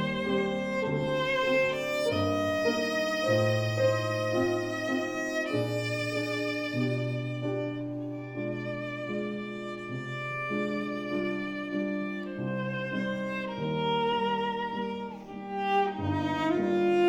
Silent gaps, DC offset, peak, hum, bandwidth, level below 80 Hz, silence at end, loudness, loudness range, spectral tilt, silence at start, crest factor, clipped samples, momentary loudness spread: none; under 0.1%; -14 dBFS; none; 19 kHz; -62 dBFS; 0 s; -30 LUFS; 6 LU; -6 dB/octave; 0 s; 14 dB; under 0.1%; 8 LU